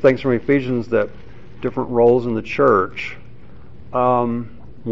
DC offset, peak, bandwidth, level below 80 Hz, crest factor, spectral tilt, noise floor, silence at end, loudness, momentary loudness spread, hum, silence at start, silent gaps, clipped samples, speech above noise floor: 2%; -2 dBFS; 7.4 kHz; -48 dBFS; 16 dB; -6 dB/octave; -43 dBFS; 0 s; -19 LUFS; 14 LU; none; 0 s; none; under 0.1%; 25 dB